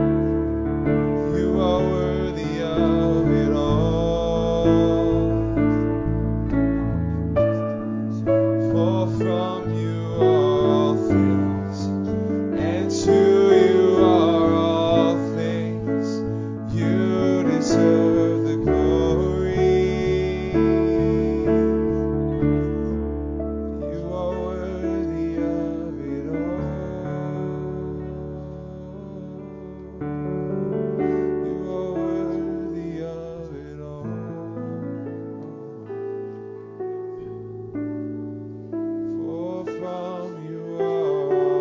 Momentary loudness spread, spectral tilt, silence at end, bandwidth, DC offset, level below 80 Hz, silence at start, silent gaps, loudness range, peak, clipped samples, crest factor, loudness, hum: 15 LU; -8 dB/octave; 0 s; 7.6 kHz; under 0.1%; -36 dBFS; 0 s; none; 13 LU; -4 dBFS; under 0.1%; 18 dB; -22 LUFS; none